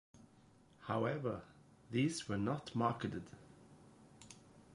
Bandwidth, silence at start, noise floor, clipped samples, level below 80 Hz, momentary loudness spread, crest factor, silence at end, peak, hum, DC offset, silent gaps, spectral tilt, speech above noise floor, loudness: 11.5 kHz; 0.15 s; -66 dBFS; under 0.1%; -70 dBFS; 22 LU; 22 dB; 0 s; -20 dBFS; none; under 0.1%; none; -6 dB/octave; 27 dB; -40 LUFS